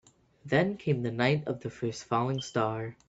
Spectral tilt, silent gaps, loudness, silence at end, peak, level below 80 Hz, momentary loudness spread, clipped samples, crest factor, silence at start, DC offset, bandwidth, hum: -6 dB/octave; none; -30 LUFS; 0.15 s; -10 dBFS; -64 dBFS; 7 LU; under 0.1%; 20 dB; 0.45 s; under 0.1%; 8 kHz; none